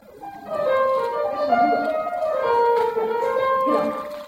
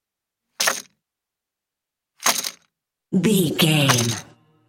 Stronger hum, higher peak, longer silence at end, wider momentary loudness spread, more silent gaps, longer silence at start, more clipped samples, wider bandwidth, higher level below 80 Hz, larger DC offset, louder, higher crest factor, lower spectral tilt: neither; second, -8 dBFS vs -2 dBFS; second, 0 s vs 0.45 s; second, 7 LU vs 11 LU; neither; second, 0.1 s vs 0.6 s; neither; about the same, 16 kHz vs 17 kHz; about the same, -62 dBFS vs -64 dBFS; neither; about the same, -21 LUFS vs -20 LUFS; second, 14 dB vs 22 dB; first, -5.5 dB/octave vs -3.5 dB/octave